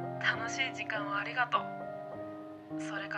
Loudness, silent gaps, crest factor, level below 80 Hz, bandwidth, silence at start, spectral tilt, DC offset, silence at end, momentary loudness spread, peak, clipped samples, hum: -35 LUFS; none; 22 dB; -76 dBFS; 11 kHz; 0 s; -3.5 dB/octave; under 0.1%; 0 s; 12 LU; -14 dBFS; under 0.1%; none